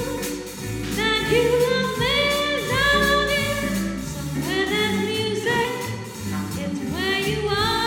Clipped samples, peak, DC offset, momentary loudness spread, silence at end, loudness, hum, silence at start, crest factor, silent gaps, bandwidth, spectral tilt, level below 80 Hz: under 0.1%; -8 dBFS; under 0.1%; 10 LU; 0 s; -22 LUFS; none; 0 s; 16 dB; none; 19.5 kHz; -4 dB/octave; -40 dBFS